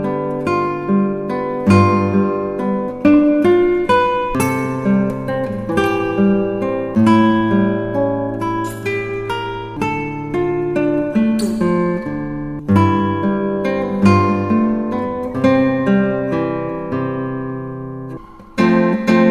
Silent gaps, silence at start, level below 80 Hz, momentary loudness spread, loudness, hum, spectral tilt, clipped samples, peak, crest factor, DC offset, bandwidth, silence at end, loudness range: none; 0 s; -42 dBFS; 10 LU; -17 LUFS; none; -7.5 dB/octave; under 0.1%; 0 dBFS; 16 dB; under 0.1%; 14.5 kHz; 0 s; 4 LU